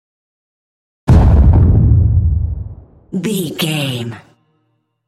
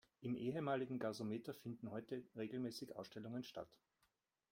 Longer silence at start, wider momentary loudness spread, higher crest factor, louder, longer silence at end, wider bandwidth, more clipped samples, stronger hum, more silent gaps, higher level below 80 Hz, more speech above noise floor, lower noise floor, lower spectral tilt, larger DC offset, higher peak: first, 1.05 s vs 0.2 s; first, 15 LU vs 10 LU; second, 12 dB vs 18 dB; first, -13 LUFS vs -47 LUFS; first, 0.9 s vs 0.75 s; second, 14 kHz vs 16.5 kHz; neither; neither; neither; first, -18 dBFS vs -82 dBFS; first, 46 dB vs 39 dB; second, -64 dBFS vs -85 dBFS; about the same, -6.5 dB/octave vs -6.5 dB/octave; neither; first, 0 dBFS vs -28 dBFS